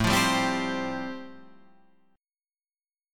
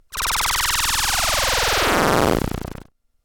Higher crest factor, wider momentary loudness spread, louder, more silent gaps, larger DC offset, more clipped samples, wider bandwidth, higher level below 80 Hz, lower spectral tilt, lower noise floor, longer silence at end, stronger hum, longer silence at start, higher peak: about the same, 20 dB vs 16 dB; first, 19 LU vs 8 LU; second, -27 LUFS vs -18 LUFS; neither; neither; neither; about the same, 17.5 kHz vs 19 kHz; second, -50 dBFS vs -32 dBFS; first, -4 dB/octave vs -2 dB/octave; first, under -90 dBFS vs -42 dBFS; second, 0 s vs 0.5 s; neither; about the same, 0 s vs 0.1 s; second, -10 dBFS vs -4 dBFS